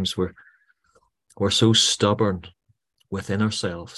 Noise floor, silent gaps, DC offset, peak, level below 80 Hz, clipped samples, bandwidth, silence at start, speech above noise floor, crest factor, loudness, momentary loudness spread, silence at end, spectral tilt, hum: -66 dBFS; none; under 0.1%; -4 dBFS; -48 dBFS; under 0.1%; 12.5 kHz; 0 s; 44 dB; 20 dB; -21 LUFS; 15 LU; 0 s; -4 dB/octave; none